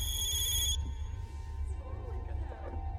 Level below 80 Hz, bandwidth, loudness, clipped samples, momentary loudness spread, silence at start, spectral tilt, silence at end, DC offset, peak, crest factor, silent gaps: -38 dBFS; 15 kHz; -35 LUFS; under 0.1%; 13 LU; 0 s; -2 dB/octave; 0 s; under 0.1%; -20 dBFS; 16 dB; none